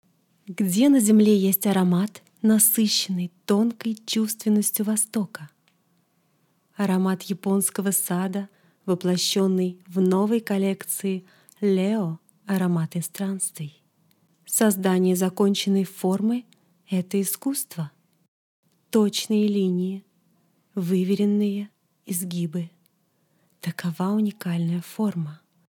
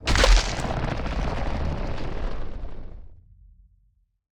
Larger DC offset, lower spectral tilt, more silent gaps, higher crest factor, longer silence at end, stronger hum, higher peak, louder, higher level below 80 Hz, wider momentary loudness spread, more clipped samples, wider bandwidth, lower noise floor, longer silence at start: neither; about the same, -5 dB/octave vs -4 dB/octave; first, 18.28-18.63 s vs none; about the same, 18 dB vs 22 dB; second, 0.35 s vs 1.15 s; neither; about the same, -6 dBFS vs -4 dBFS; first, -23 LUFS vs -26 LUFS; second, -78 dBFS vs -28 dBFS; second, 13 LU vs 21 LU; neither; first, 19 kHz vs 11.5 kHz; first, -68 dBFS vs -64 dBFS; first, 0.5 s vs 0 s